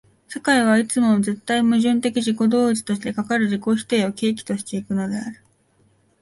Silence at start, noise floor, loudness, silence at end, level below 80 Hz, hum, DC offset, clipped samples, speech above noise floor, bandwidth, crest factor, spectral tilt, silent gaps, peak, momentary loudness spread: 0.3 s; -60 dBFS; -20 LUFS; 0.9 s; -62 dBFS; none; under 0.1%; under 0.1%; 41 dB; 11.5 kHz; 16 dB; -5 dB/octave; none; -4 dBFS; 9 LU